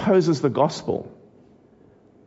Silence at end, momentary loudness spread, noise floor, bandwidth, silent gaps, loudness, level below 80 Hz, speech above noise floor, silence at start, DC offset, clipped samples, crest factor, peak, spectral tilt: 1.15 s; 11 LU; -54 dBFS; 8 kHz; none; -22 LUFS; -62 dBFS; 33 dB; 0 s; under 0.1%; under 0.1%; 18 dB; -6 dBFS; -6.5 dB/octave